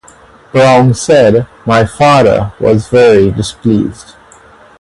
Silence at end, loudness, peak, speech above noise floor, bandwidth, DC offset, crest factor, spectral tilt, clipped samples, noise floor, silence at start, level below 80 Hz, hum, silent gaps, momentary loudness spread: 0.8 s; -9 LUFS; 0 dBFS; 31 dB; 11.5 kHz; under 0.1%; 10 dB; -6 dB/octave; 0.1%; -39 dBFS; 0.55 s; -36 dBFS; none; none; 7 LU